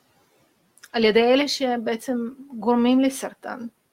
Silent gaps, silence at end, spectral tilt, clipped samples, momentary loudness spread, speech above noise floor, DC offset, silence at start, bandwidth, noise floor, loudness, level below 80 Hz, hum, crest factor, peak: none; 0.25 s; -4 dB/octave; under 0.1%; 15 LU; 41 dB; under 0.1%; 0.95 s; 16 kHz; -63 dBFS; -22 LUFS; -62 dBFS; none; 18 dB; -4 dBFS